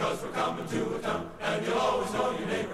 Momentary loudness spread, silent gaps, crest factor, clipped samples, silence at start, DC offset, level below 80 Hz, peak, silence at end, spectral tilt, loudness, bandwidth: 5 LU; none; 14 dB; under 0.1%; 0 s; under 0.1%; -56 dBFS; -16 dBFS; 0 s; -4.5 dB/octave; -30 LUFS; 15 kHz